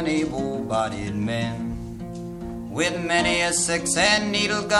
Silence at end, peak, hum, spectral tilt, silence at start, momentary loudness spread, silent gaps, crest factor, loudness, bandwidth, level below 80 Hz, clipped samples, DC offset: 0 s; -4 dBFS; none; -3 dB/octave; 0 s; 15 LU; none; 20 dB; -23 LUFS; 13 kHz; -44 dBFS; under 0.1%; under 0.1%